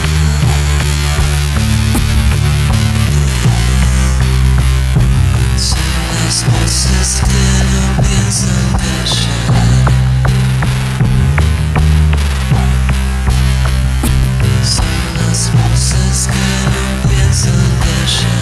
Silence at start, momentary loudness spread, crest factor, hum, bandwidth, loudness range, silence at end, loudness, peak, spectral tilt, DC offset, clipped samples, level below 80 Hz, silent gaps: 0 s; 3 LU; 10 dB; none; 13.5 kHz; 1 LU; 0 s; -12 LUFS; 0 dBFS; -4.5 dB/octave; under 0.1%; under 0.1%; -14 dBFS; none